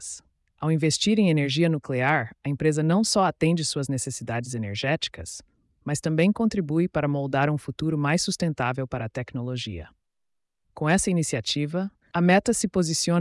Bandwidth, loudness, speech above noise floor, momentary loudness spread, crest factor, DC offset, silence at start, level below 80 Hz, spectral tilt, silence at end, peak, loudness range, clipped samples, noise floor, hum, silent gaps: 12 kHz; -25 LUFS; 57 dB; 10 LU; 16 dB; under 0.1%; 0 s; -54 dBFS; -5 dB/octave; 0 s; -8 dBFS; 5 LU; under 0.1%; -81 dBFS; none; none